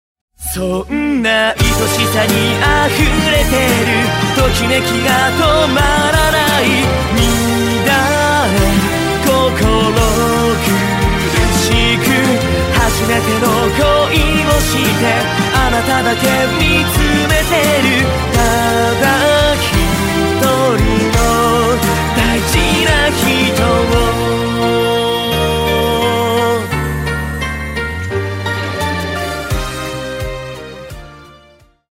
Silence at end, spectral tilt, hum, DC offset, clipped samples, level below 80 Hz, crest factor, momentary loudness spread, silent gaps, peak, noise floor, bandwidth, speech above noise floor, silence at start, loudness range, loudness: 0.65 s; -4.5 dB/octave; none; under 0.1%; under 0.1%; -24 dBFS; 12 dB; 8 LU; none; 0 dBFS; -47 dBFS; 16.5 kHz; 35 dB; 0.4 s; 5 LU; -13 LUFS